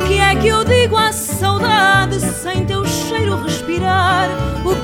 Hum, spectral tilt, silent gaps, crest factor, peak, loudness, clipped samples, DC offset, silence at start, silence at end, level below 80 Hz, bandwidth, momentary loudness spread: none; -4 dB/octave; none; 14 dB; -2 dBFS; -15 LUFS; under 0.1%; under 0.1%; 0 s; 0 s; -30 dBFS; 18 kHz; 7 LU